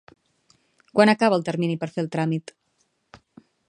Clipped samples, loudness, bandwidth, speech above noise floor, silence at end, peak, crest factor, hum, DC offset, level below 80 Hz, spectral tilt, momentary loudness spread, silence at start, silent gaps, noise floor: under 0.1%; -22 LUFS; 10.5 kHz; 49 dB; 0.55 s; -2 dBFS; 22 dB; none; under 0.1%; -70 dBFS; -6.5 dB/octave; 10 LU; 0.95 s; none; -70 dBFS